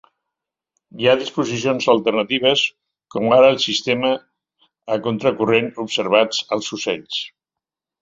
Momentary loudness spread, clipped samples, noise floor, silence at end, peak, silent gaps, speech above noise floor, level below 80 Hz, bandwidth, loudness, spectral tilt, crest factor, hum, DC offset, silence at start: 11 LU; under 0.1%; -86 dBFS; 0.75 s; -2 dBFS; none; 68 dB; -62 dBFS; 7.8 kHz; -18 LUFS; -4 dB/octave; 18 dB; none; under 0.1%; 0.95 s